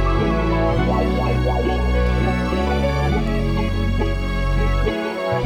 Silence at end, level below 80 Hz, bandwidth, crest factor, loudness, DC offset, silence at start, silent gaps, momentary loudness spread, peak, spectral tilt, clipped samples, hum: 0 s; -22 dBFS; 10.5 kHz; 12 dB; -20 LUFS; under 0.1%; 0 s; none; 3 LU; -6 dBFS; -7.5 dB/octave; under 0.1%; none